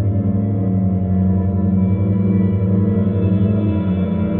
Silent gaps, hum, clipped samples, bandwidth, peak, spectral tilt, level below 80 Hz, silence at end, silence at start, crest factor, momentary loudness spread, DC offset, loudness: none; none; under 0.1%; 3.7 kHz; -6 dBFS; -11.5 dB/octave; -38 dBFS; 0 s; 0 s; 10 dB; 2 LU; under 0.1%; -17 LUFS